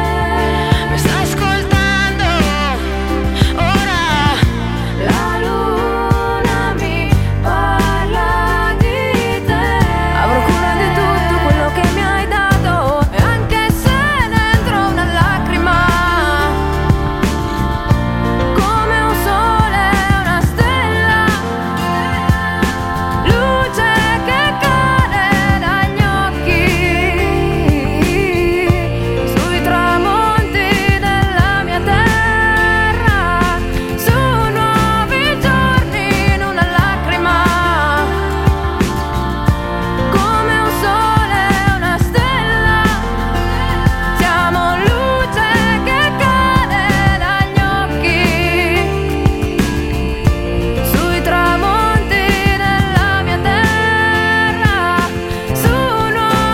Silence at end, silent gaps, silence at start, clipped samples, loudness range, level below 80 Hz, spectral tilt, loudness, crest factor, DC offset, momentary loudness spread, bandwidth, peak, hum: 0 s; none; 0 s; under 0.1%; 2 LU; -22 dBFS; -5.5 dB/octave; -14 LUFS; 14 dB; under 0.1%; 4 LU; 16.5 kHz; 0 dBFS; none